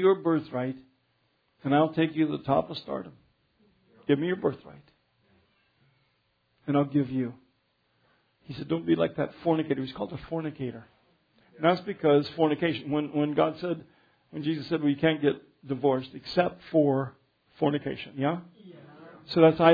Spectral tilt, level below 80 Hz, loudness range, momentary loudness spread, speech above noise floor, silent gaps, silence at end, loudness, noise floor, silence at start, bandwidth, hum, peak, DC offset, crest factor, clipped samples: -9 dB/octave; -64 dBFS; 6 LU; 13 LU; 46 dB; none; 0 s; -28 LUFS; -72 dBFS; 0 s; 5 kHz; none; -6 dBFS; under 0.1%; 22 dB; under 0.1%